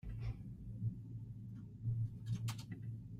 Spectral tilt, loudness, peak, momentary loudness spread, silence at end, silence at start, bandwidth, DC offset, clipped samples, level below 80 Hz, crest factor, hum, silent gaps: -6.5 dB/octave; -46 LUFS; -30 dBFS; 9 LU; 0 s; 0.05 s; 13.5 kHz; under 0.1%; under 0.1%; -56 dBFS; 14 dB; none; none